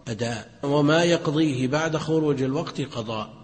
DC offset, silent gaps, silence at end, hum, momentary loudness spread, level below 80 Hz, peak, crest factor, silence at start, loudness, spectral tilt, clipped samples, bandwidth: under 0.1%; none; 0 s; none; 11 LU; -56 dBFS; -8 dBFS; 16 dB; 0.05 s; -24 LUFS; -6 dB/octave; under 0.1%; 8.8 kHz